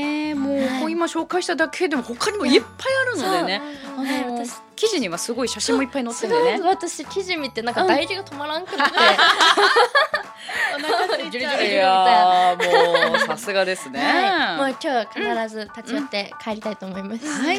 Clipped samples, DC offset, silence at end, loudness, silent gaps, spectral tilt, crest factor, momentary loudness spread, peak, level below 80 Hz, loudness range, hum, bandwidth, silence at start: under 0.1%; under 0.1%; 0 s; -20 LUFS; none; -2.5 dB/octave; 20 dB; 13 LU; -2 dBFS; -64 dBFS; 6 LU; none; 16 kHz; 0 s